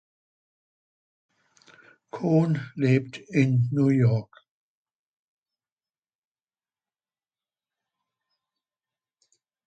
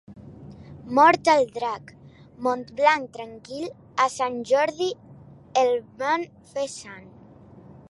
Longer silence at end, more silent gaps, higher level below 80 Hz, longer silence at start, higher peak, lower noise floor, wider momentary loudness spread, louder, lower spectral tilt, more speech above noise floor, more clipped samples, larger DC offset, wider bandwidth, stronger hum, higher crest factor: first, 5.45 s vs 0.9 s; neither; second, -68 dBFS vs -62 dBFS; first, 2.15 s vs 0.1 s; second, -10 dBFS vs -4 dBFS; first, under -90 dBFS vs -48 dBFS; second, 8 LU vs 23 LU; about the same, -24 LUFS vs -23 LUFS; first, -8.5 dB/octave vs -4 dB/octave; first, over 67 dB vs 25 dB; neither; neither; second, 8.2 kHz vs 11.5 kHz; neither; about the same, 20 dB vs 20 dB